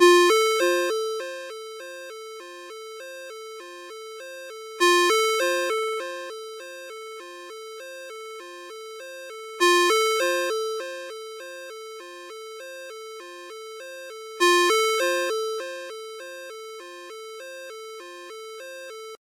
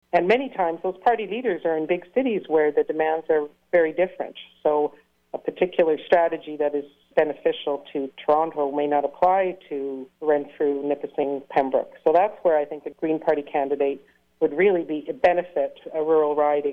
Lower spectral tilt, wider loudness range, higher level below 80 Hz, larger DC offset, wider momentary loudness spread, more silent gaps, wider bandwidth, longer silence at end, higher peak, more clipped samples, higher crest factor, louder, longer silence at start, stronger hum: second, 1 dB/octave vs -7.5 dB/octave; first, 14 LU vs 1 LU; second, under -90 dBFS vs -64 dBFS; neither; first, 20 LU vs 9 LU; neither; first, 16 kHz vs 5.6 kHz; about the same, 0.05 s vs 0 s; first, -4 dBFS vs -8 dBFS; neither; first, 22 dB vs 16 dB; about the same, -22 LUFS vs -23 LUFS; second, 0 s vs 0.15 s; neither